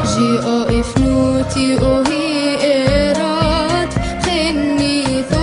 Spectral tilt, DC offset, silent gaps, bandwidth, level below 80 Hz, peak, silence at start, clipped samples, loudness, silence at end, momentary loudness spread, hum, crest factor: -5.5 dB/octave; under 0.1%; none; 11 kHz; -28 dBFS; -2 dBFS; 0 s; under 0.1%; -15 LUFS; 0 s; 3 LU; none; 14 dB